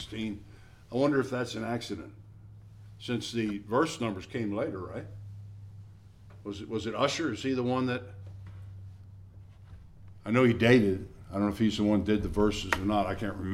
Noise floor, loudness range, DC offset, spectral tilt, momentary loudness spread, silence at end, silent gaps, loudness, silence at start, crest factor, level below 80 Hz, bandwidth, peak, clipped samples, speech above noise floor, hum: -51 dBFS; 8 LU; under 0.1%; -6 dB/octave; 21 LU; 0 s; none; -30 LUFS; 0 s; 24 dB; -52 dBFS; 14.5 kHz; -6 dBFS; under 0.1%; 22 dB; none